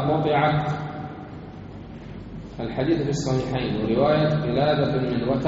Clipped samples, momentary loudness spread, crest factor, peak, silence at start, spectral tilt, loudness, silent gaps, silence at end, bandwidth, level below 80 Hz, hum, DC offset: under 0.1%; 18 LU; 16 dB; -8 dBFS; 0 s; -6 dB/octave; -23 LUFS; none; 0 s; 7.6 kHz; -46 dBFS; none; under 0.1%